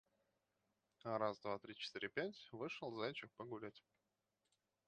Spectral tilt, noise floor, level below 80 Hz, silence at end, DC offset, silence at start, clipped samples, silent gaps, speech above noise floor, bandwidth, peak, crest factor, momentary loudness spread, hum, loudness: -5.5 dB/octave; -87 dBFS; -86 dBFS; 1.1 s; under 0.1%; 1.05 s; under 0.1%; none; 40 dB; 8.8 kHz; -26 dBFS; 24 dB; 10 LU; none; -47 LUFS